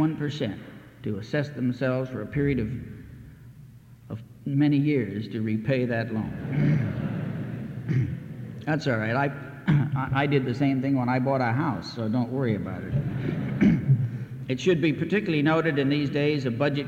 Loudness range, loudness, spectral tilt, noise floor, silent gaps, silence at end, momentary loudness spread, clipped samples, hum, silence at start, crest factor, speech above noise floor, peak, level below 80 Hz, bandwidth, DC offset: 5 LU; -26 LUFS; -8 dB/octave; -48 dBFS; none; 0 s; 12 LU; under 0.1%; none; 0 s; 16 dB; 23 dB; -10 dBFS; -52 dBFS; 7.6 kHz; under 0.1%